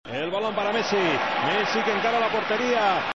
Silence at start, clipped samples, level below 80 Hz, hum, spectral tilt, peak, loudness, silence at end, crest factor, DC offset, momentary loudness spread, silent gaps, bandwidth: 0.05 s; under 0.1%; -62 dBFS; none; -4 dB/octave; -10 dBFS; -23 LUFS; 0.05 s; 14 dB; 0.3%; 4 LU; none; 7.8 kHz